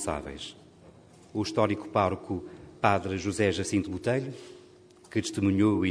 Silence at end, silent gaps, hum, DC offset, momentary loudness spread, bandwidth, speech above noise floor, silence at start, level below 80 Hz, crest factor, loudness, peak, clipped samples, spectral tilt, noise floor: 0 s; none; none; under 0.1%; 15 LU; 11 kHz; 27 dB; 0 s; -56 dBFS; 24 dB; -29 LUFS; -6 dBFS; under 0.1%; -5.5 dB/octave; -54 dBFS